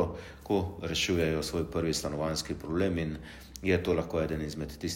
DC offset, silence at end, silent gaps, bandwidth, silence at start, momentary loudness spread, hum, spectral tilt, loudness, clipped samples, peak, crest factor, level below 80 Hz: under 0.1%; 0 s; none; 16 kHz; 0 s; 9 LU; none; -5 dB/octave; -31 LUFS; under 0.1%; -14 dBFS; 18 dB; -48 dBFS